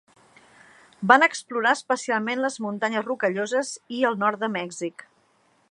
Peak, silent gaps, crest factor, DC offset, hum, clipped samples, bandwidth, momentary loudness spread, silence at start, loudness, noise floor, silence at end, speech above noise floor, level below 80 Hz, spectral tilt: -2 dBFS; none; 24 dB; under 0.1%; none; under 0.1%; 11.5 kHz; 14 LU; 1 s; -24 LUFS; -64 dBFS; 0.7 s; 40 dB; -78 dBFS; -3.5 dB/octave